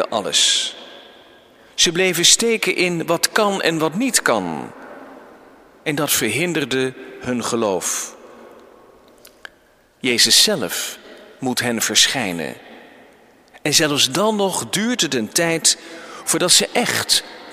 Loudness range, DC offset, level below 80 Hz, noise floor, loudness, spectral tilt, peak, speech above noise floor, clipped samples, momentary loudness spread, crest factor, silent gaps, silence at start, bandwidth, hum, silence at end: 6 LU; under 0.1%; -58 dBFS; -54 dBFS; -17 LUFS; -2 dB/octave; 0 dBFS; 36 dB; under 0.1%; 15 LU; 20 dB; none; 0 s; 16 kHz; none; 0 s